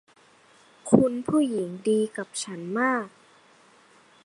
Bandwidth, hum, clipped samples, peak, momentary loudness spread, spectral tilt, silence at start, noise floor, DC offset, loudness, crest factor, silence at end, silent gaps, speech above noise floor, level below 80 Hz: 11.5 kHz; none; under 0.1%; -2 dBFS; 12 LU; -5.5 dB/octave; 0.85 s; -57 dBFS; under 0.1%; -25 LUFS; 26 dB; 1.15 s; none; 33 dB; -64 dBFS